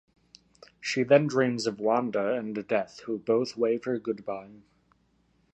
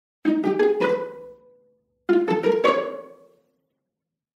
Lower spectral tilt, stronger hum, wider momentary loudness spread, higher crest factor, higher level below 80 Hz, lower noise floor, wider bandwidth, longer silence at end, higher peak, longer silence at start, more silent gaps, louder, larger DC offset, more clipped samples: about the same, -5.5 dB/octave vs -6.5 dB/octave; neither; second, 12 LU vs 16 LU; about the same, 22 dB vs 20 dB; about the same, -72 dBFS vs -76 dBFS; second, -68 dBFS vs -84 dBFS; second, 8.6 kHz vs 10.5 kHz; second, 0.95 s vs 1.25 s; about the same, -6 dBFS vs -4 dBFS; first, 0.8 s vs 0.25 s; neither; second, -28 LUFS vs -22 LUFS; neither; neither